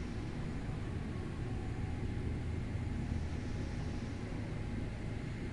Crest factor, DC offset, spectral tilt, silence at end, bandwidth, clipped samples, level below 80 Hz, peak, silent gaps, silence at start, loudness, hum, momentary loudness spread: 16 dB; under 0.1%; -7.5 dB/octave; 0 s; 11.5 kHz; under 0.1%; -46 dBFS; -24 dBFS; none; 0 s; -41 LUFS; none; 2 LU